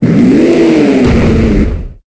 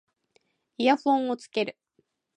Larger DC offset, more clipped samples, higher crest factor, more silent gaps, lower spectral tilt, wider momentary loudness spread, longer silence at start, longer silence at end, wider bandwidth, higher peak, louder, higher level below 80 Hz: neither; first, 0.2% vs under 0.1%; second, 8 dB vs 20 dB; neither; first, -8 dB/octave vs -4.5 dB/octave; about the same, 7 LU vs 8 LU; second, 0 s vs 0.8 s; second, 0.15 s vs 0.65 s; second, 8 kHz vs 10 kHz; first, 0 dBFS vs -8 dBFS; first, -8 LUFS vs -26 LUFS; first, -18 dBFS vs -80 dBFS